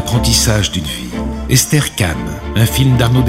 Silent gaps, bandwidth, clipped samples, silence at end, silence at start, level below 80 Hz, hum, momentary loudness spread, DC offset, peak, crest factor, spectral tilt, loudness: none; 16.5 kHz; under 0.1%; 0 s; 0 s; -26 dBFS; none; 10 LU; under 0.1%; 0 dBFS; 14 dB; -4 dB/octave; -14 LUFS